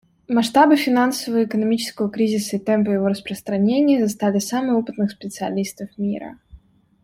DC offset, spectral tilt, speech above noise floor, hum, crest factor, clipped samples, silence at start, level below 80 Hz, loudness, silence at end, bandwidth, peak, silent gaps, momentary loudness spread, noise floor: under 0.1%; -5.5 dB/octave; 29 dB; none; 18 dB; under 0.1%; 0.3 s; -58 dBFS; -20 LUFS; 0.45 s; 16.5 kHz; -2 dBFS; none; 11 LU; -48 dBFS